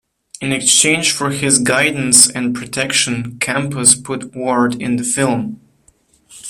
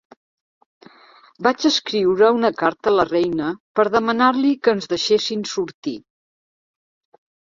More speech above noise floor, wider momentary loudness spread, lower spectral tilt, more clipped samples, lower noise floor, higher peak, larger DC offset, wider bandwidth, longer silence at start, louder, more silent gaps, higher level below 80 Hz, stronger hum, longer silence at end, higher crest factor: first, 39 dB vs 32 dB; about the same, 11 LU vs 10 LU; second, -2 dB/octave vs -4 dB/octave; first, 0.1% vs under 0.1%; first, -55 dBFS vs -50 dBFS; about the same, 0 dBFS vs -2 dBFS; neither; first, over 20 kHz vs 7.6 kHz; second, 0.4 s vs 1.4 s; first, -13 LUFS vs -19 LUFS; second, none vs 3.60-3.75 s, 5.74-5.82 s; first, -54 dBFS vs -60 dBFS; neither; second, 0 s vs 1.55 s; about the same, 16 dB vs 18 dB